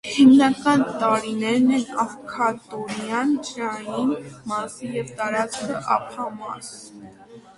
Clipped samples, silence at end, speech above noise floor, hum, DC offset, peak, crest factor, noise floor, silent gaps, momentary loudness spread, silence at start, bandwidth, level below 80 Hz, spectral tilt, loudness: under 0.1%; 0.15 s; 24 dB; none; under 0.1%; -4 dBFS; 18 dB; -45 dBFS; none; 15 LU; 0.05 s; 11.5 kHz; -62 dBFS; -4.5 dB/octave; -22 LUFS